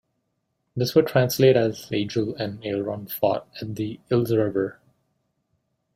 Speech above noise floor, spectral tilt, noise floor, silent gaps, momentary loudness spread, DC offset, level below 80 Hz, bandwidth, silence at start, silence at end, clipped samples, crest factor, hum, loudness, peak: 52 dB; -6 dB/octave; -75 dBFS; none; 12 LU; under 0.1%; -60 dBFS; 16 kHz; 0.75 s; 1.25 s; under 0.1%; 20 dB; none; -23 LUFS; -4 dBFS